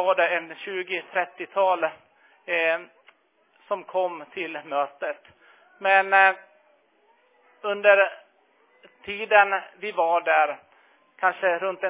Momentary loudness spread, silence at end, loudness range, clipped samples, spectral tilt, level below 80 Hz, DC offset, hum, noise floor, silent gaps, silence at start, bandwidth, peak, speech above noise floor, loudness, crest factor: 15 LU; 0 s; 6 LU; under 0.1%; -6 dB/octave; -76 dBFS; under 0.1%; none; -64 dBFS; none; 0 s; 3.9 kHz; -4 dBFS; 41 dB; -23 LUFS; 20 dB